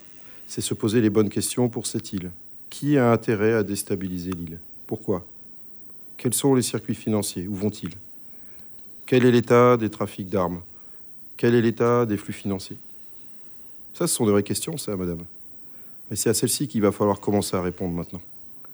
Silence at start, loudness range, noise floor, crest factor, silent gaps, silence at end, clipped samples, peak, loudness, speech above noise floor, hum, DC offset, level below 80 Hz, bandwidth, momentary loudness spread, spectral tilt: 0 s; 5 LU; -43 dBFS; 18 dB; none; 0 s; under 0.1%; -6 dBFS; -23 LUFS; 20 dB; none; under 0.1%; -58 dBFS; over 20 kHz; 19 LU; -5 dB/octave